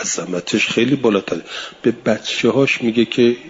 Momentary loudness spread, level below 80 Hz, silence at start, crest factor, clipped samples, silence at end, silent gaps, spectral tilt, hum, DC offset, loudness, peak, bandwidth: 7 LU; -58 dBFS; 0 s; 14 dB; under 0.1%; 0 s; none; -4 dB/octave; none; under 0.1%; -17 LUFS; -2 dBFS; 7.8 kHz